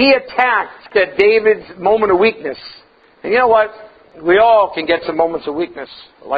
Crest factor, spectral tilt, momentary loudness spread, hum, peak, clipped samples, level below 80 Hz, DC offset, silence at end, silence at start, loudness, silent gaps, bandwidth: 14 dB; -7 dB/octave; 15 LU; none; 0 dBFS; under 0.1%; -52 dBFS; under 0.1%; 0 s; 0 s; -14 LUFS; none; 5 kHz